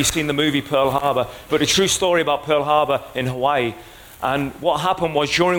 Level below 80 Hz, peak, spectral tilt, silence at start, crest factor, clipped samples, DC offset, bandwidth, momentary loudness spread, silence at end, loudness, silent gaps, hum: -46 dBFS; -4 dBFS; -3.5 dB/octave; 0 s; 16 dB; under 0.1%; under 0.1%; 17 kHz; 7 LU; 0 s; -19 LUFS; none; none